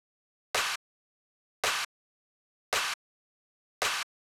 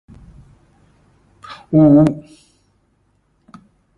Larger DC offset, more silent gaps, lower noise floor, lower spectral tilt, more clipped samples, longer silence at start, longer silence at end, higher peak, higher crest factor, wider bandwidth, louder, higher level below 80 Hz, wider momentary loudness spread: neither; first, 0.76-1.63 s, 1.85-2.72 s, 2.94-3.81 s vs none; first, under -90 dBFS vs -61 dBFS; second, 1 dB/octave vs -10 dB/octave; neither; second, 0.55 s vs 1.5 s; second, 0.3 s vs 1.8 s; second, -18 dBFS vs -2 dBFS; about the same, 18 dB vs 18 dB; first, over 20 kHz vs 5.8 kHz; second, -32 LUFS vs -13 LUFS; second, -70 dBFS vs -50 dBFS; second, 8 LU vs 27 LU